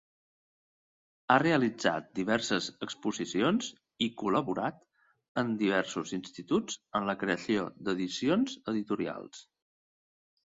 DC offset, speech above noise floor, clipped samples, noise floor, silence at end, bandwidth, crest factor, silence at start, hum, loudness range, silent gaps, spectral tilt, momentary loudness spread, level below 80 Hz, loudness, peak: under 0.1%; over 59 dB; under 0.1%; under -90 dBFS; 1.1 s; 7.8 kHz; 24 dB; 1.3 s; none; 3 LU; 5.28-5.35 s; -4.5 dB/octave; 10 LU; -70 dBFS; -31 LUFS; -8 dBFS